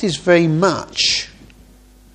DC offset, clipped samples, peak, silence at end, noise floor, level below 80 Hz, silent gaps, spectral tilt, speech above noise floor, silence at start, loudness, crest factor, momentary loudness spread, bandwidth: under 0.1%; under 0.1%; 0 dBFS; 0.85 s; -46 dBFS; -48 dBFS; none; -4 dB/octave; 31 dB; 0 s; -16 LUFS; 18 dB; 6 LU; 10 kHz